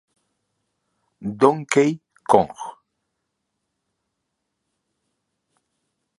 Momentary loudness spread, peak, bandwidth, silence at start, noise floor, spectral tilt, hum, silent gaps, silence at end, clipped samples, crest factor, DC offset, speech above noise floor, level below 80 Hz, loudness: 16 LU; 0 dBFS; 11.5 kHz; 1.2 s; -78 dBFS; -5.5 dB/octave; none; none; 3.45 s; under 0.1%; 26 dB; under 0.1%; 59 dB; -64 dBFS; -19 LUFS